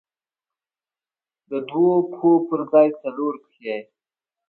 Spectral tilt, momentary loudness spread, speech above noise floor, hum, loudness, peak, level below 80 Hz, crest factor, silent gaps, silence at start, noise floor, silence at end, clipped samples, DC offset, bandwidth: -10.5 dB/octave; 14 LU; over 70 dB; none; -21 LUFS; -4 dBFS; -74 dBFS; 18 dB; none; 1.5 s; under -90 dBFS; 0.65 s; under 0.1%; under 0.1%; 4.3 kHz